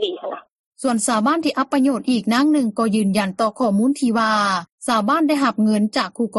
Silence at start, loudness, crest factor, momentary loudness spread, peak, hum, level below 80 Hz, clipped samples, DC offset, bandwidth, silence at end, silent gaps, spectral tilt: 0 s; -19 LUFS; 14 dB; 6 LU; -6 dBFS; none; -66 dBFS; under 0.1%; under 0.1%; 12 kHz; 0 s; 0.52-0.72 s, 4.72-4.78 s; -4.5 dB/octave